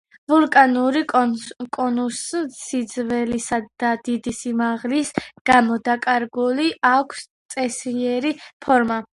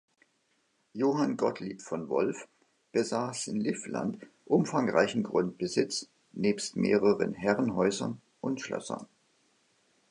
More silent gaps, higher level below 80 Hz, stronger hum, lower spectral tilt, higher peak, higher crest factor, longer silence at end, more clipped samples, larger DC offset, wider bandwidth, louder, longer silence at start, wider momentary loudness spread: first, 5.41-5.45 s, 7.30-7.49 s, 8.53-8.60 s vs none; first, -58 dBFS vs -70 dBFS; neither; second, -3.5 dB/octave vs -5 dB/octave; first, 0 dBFS vs -10 dBFS; about the same, 20 dB vs 22 dB; second, 0.15 s vs 1.05 s; neither; neither; about the same, 11.5 kHz vs 11 kHz; first, -20 LUFS vs -30 LUFS; second, 0.3 s vs 0.95 s; about the same, 10 LU vs 11 LU